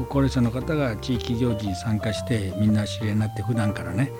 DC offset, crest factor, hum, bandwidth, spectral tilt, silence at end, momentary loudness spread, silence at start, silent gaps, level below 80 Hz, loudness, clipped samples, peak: under 0.1%; 14 dB; none; 16.5 kHz; -7 dB/octave; 0 s; 4 LU; 0 s; none; -42 dBFS; -25 LUFS; under 0.1%; -10 dBFS